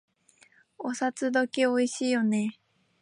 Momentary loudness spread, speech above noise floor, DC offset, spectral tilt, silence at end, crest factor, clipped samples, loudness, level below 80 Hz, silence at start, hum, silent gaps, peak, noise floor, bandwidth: 10 LU; 35 dB; under 0.1%; -4.5 dB/octave; 0.5 s; 16 dB; under 0.1%; -28 LUFS; -82 dBFS; 0.8 s; none; none; -12 dBFS; -62 dBFS; 11 kHz